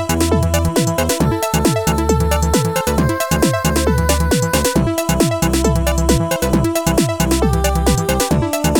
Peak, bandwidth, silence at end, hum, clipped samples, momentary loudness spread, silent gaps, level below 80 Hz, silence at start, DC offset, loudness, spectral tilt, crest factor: 0 dBFS; 19.5 kHz; 0 s; none; under 0.1%; 1 LU; none; -22 dBFS; 0 s; 0.3%; -16 LUFS; -5 dB/octave; 14 dB